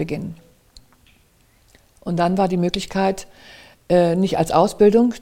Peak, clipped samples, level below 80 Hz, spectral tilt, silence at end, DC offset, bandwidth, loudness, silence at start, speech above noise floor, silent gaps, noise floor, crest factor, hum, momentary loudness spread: -2 dBFS; under 0.1%; -48 dBFS; -6.5 dB/octave; 0 s; under 0.1%; 16 kHz; -18 LUFS; 0 s; 38 dB; none; -56 dBFS; 18 dB; none; 15 LU